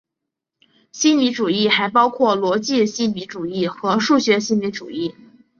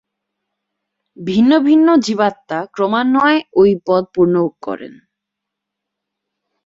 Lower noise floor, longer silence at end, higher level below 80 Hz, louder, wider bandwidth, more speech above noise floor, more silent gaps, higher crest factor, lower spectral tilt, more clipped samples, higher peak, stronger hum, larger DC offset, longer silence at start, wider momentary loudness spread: about the same, -82 dBFS vs -80 dBFS; second, 0.5 s vs 1.75 s; second, -64 dBFS vs -56 dBFS; second, -18 LUFS vs -14 LUFS; about the same, 7.4 kHz vs 7.8 kHz; about the same, 64 dB vs 66 dB; neither; about the same, 18 dB vs 14 dB; second, -4 dB/octave vs -6 dB/octave; neither; about the same, -2 dBFS vs -2 dBFS; neither; neither; second, 0.95 s vs 1.2 s; second, 11 LU vs 14 LU